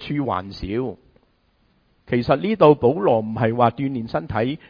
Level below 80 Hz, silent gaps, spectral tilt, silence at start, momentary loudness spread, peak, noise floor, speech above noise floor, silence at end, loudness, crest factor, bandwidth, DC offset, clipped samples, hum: -48 dBFS; none; -9.5 dB/octave; 0 s; 12 LU; 0 dBFS; -62 dBFS; 43 dB; 0.15 s; -20 LUFS; 20 dB; 5.2 kHz; under 0.1%; under 0.1%; none